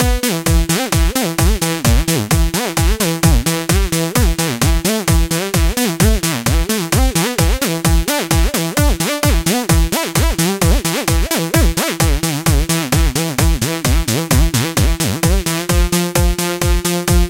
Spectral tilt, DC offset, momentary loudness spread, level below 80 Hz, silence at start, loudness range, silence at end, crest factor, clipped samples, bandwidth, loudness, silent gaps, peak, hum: -4 dB/octave; under 0.1%; 2 LU; -18 dBFS; 0 s; 0 LU; 0 s; 14 dB; under 0.1%; 17 kHz; -15 LUFS; none; 0 dBFS; none